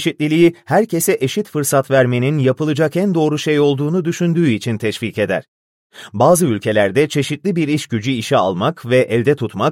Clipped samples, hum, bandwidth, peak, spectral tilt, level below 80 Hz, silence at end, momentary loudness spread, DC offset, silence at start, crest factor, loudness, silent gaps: under 0.1%; none; 16.5 kHz; -2 dBFS; -5.5 dB/octave; -58 dBFS; 0 s; 6 LU; under 0.1%; 0 s; 14 dB; -16 LUFS; 5.48-5.90 s